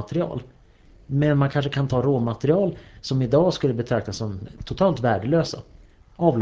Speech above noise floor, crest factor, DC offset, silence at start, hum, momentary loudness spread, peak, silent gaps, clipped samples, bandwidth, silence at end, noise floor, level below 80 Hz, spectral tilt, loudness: 29 dB; 18 dB; under 0.1%; 0 s; none; 12 LU; -4 dBFS; none; under 0.1%; 8 kHz; 0 s; -51 dBFS; -46 dBFS; -7.5 dB/octave; -23 LUFS